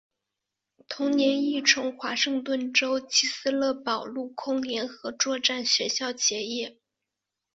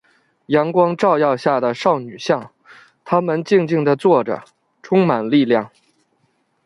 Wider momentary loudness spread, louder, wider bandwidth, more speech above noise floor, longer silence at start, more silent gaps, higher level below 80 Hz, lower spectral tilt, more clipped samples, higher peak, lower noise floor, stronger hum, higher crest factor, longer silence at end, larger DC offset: first, 10 LU vs 6 LU; second, -25 LUFS vs -17 LUFS; second, 8 kHz vs 11.5 kHz; first, 59 dB vs 48 dB; first, 0.9 s vs 0.5 s; neither; second, -74 dBFS vs -64 dBFS; second, -0.5 dB/octave vs -7 dB/octave; neither; second, -6 dBFS vs -2 dBFS; first, -86 dBFS vs -64 dBFS; neither; first, 22 dB vs 16 dB; second, 0.85 s vs 1 s; neither